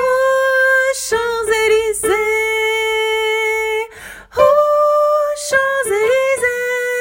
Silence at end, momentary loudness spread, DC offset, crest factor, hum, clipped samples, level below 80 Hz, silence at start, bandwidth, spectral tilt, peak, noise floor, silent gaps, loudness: 0 s; 6 LU; under 0.1%; 16 dB; none; under 0.1%; -48 dBFS; 0 s; 16.5 kHz; -1 dB/octave; 0 dBFS; -35 dBFS; none; -15 LUFS